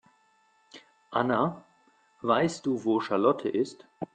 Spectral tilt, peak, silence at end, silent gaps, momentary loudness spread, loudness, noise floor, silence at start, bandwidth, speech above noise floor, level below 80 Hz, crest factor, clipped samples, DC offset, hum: -6 dB/octave; -10 dBFS; 0.1 s; none; 10 LU; -28 LUFS; -66 dBFS; 0.75 s; 9.4 kHz; 39 dB; -70 dBFS; 20 dB; under 0.1%; under 0.1%; none